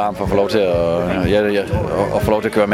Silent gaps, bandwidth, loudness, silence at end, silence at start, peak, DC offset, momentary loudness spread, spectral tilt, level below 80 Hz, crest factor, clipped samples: none; 16 kHz; -17 LUFS; 0 s; 0 s; 0 dBFS; under 0.1%; 3 LU; -6.5 dB/octave; -34 dBFS; 16 dB; under 0.1%